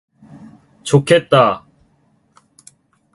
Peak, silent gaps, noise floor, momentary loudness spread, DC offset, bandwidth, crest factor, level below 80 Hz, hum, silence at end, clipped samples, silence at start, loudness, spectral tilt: 0 dBFS; none; -58 dBFS; 16 LU; under 0.1%; 11.5 kHz; 18 dB; -56 dBFS; none; 1.55 s; under 0.1%; 0.85 s; -14 LUFS; -5.5 dB/octave